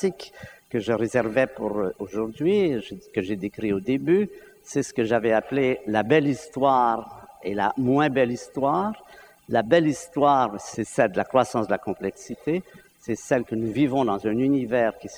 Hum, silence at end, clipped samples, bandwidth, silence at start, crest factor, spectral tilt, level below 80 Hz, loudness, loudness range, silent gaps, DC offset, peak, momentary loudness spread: none; 0 s; under 0.1%; 19.5 kHz; 0 s; 18 dB; -6 dB/octave; -58 dBFS; -24 LUFS; 3 LU; none; under 0.1%; -4 dBFS; 11 LU